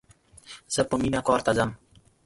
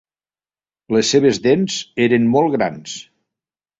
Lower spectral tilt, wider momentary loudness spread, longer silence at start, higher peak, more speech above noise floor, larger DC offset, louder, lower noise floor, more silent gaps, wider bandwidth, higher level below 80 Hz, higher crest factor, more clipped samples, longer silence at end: about the same, -4.5 dB/octave vs -4.5 dB/octave; about the same, 16 LU vs 14 LU; second, 0.5 s vs 0.9 s; second, -6 dBFS vs -2 dBFS; second, 27 dB vs over 74 dB; neither; second, -25 LUFS vs -16 LUFS; second, -51 dBFS vs under -90 dBFS; neither; first, 11.5 kHz vs 8 kHz; first, -50 dBFS vs -58 dBFS; about the same, 20 dB vs 16 dB; neither; second, 0.5 s vs 0.8 s